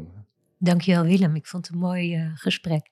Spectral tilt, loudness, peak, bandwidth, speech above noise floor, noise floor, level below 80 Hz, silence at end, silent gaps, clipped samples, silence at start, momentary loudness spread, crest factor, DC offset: -7 dB/octave; -23 LUFS; -8 dBFS; 12 kHz; 26 dB; -49 dBFS; -66 dBFS; 0.1 s; none; under 0.1%; 0 s; 8 LU; 16 dB; under 0.1%